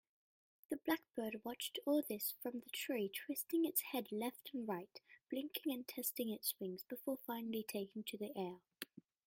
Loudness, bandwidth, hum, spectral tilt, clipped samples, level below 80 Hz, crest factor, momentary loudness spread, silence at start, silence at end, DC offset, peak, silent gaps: -43 LUFS; 16.5 kHz; none; -3.5 dB/octave; under 0.1%; -88 dBFS; 22 dB; 9 LU; 0.7 s; 0.25 s; under 0.1%; -22 dBFS; none